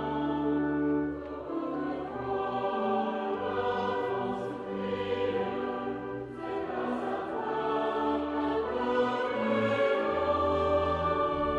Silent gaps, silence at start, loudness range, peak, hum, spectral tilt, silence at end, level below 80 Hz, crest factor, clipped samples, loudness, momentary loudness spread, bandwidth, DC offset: none; 0 s; 4 LU; -16 dBFS; none; -7.5 dB/octave; 0 s; -54 dBFS; 14 dB; under 0.1%; -31 LUFS; 8 LU; 8.4 kHz; under 0.1%